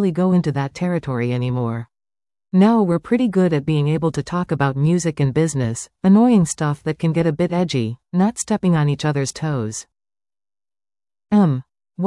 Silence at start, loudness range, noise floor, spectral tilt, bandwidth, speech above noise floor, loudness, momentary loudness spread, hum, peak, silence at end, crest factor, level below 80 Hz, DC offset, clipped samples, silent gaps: 0 s; 4 LU; under -90 dBFS; -6.5 dB/octave; 12 kHz; over 72 dB; -19 LUFS; 9 LU; none; -4 dBFS; 0 s; 14 dB; -52 dBFS; under 0.1%; under 0.1%; none